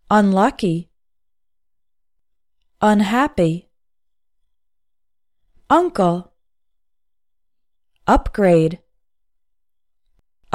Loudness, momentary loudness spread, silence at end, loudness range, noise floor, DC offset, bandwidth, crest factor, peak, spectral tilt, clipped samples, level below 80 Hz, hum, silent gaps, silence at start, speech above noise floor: -18 LUFS; 12 LU; 1.8 s; 3 LU; -83 dBFS; under 0.1%; 14 kHz; 18 dB; -2 dBFS; -7 dB/octave; under 0.1%; -38 dBFS; none; none; 0.1 s; 67 dB